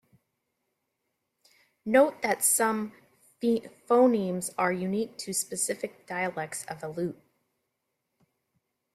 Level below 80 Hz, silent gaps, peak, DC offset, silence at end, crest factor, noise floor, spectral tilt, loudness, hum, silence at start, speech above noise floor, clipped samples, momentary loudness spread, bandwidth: -74 dBFS; none; -8 dBFS; under 0.1%; 1.8 s; 22 dB; -81 dBFS; -4 dB/octave; -28 LUFS; none; 1.85 s; 54 dB; under 0.1%; 13 LU; 16 kHz